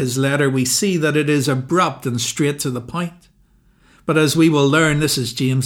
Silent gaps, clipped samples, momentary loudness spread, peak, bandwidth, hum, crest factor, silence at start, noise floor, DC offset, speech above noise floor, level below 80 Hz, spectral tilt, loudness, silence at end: none; under 0.1%; 10 LU; -2 dBFS; 18 kHz; none; 14 dB; 0 s; -55 dBFS; under 0.1%; 38 dB; -50 dBFS; -4.5 dB/octave; -17 LUFS; 0 s